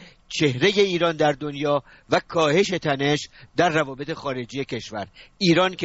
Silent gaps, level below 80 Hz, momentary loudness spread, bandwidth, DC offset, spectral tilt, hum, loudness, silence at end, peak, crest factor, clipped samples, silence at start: none; -56 dBFS; 11 LU; 8 kHz; under 0.1%; -3.5 dB/octave; none; -22 LUFS; 0 s; -4 dBFS; 20 dB; under 0.1%; 0 s